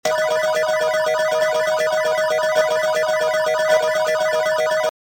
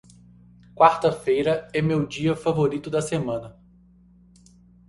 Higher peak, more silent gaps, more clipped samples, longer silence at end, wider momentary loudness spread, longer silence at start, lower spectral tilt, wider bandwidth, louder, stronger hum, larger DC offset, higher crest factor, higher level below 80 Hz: about the same, -4 dBFS vs -2 dBFS; neither; neither; second, 0.25 s vs 1.35 s; second, 2 LU vs 9 LU; second, 0.05 s vs 0.75 s; second, -1.5 dB/octave vs -6.5 dB/octave; first, 17 kHz vs 11.5 kHz; first, -18 LUFS vs -23 LUFS; second, none vs 60 Hz at -45 dBFS; neither; second, 14 dB vs 22 dB; second, -64 dBFS vs -54 dBFS